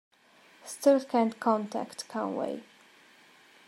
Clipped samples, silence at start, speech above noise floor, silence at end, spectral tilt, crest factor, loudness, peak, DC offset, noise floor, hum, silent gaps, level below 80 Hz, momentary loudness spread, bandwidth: under 0.1%; 0.65 s; 31 dB; 1.05 s; -5 dB/octave; 20 dB; -29 LUFS; -10 dBFS; under 0.1%; -60 dBFS; none; none; -86 dBFS; 16 LU; 13.5 kHz